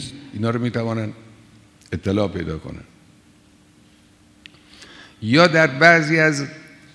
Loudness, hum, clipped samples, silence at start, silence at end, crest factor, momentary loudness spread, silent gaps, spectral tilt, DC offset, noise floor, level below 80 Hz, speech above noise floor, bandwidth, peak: -18 LUFS; none; under 0.1%; 0 s; 0.35 s; 22 dB; 20 LU; none; -5.5 dB/octave; under 0.1%; -53 dBFS; -52 dBFS; 35 dB; 11 kHz; 0 dBFS